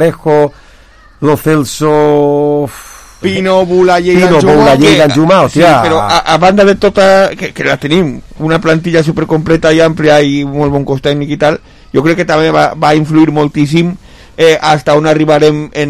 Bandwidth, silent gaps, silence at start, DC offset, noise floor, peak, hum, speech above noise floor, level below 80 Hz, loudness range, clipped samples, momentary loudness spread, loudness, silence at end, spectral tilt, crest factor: 15.5 kHz; none; 0 s; 0.6%; -39 dBFS; 0 dBFS; none; 31 dB; -36 dBFS; 4 LU; 0.8%; 7 LU; -9 LUFS; 0 s; -6 dB/octave; 8 dB